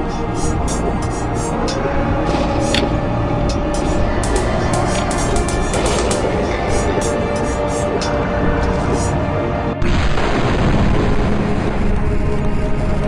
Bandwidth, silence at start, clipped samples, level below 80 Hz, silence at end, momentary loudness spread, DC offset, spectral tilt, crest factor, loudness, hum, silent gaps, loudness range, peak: 11.5 kHz; 0 s; under 0.1%; -22 dBFS; 0 s; 3 LU; under 0.1%; -5.5 dB/octave; 16 dB; -18 LUFS; none; none; 1 LU; -2 dBFS